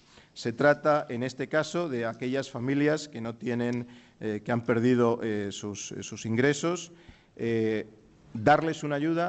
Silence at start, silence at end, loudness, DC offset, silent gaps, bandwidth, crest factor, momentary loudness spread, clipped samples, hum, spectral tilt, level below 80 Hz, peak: 0.35 s; 0 s; -28 LUFS; under 0.1%; none; 8.4 kHz; 18 dB; 13 LU; under 0.1%; none; -5.5 dB/octave; -64 dBFS; -10 dBFS